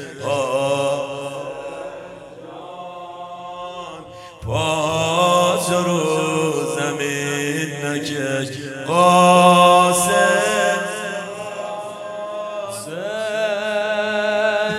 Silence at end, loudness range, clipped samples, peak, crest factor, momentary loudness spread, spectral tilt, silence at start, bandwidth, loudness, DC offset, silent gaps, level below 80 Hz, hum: 0 s; 12 LU; under 0.1%; 0 dBFS; 18 dB; 21 LU; -4 dB/octave; 0 s; 16 kHz; -18 LUFS; under 0.1%; none; -56 dBFS; none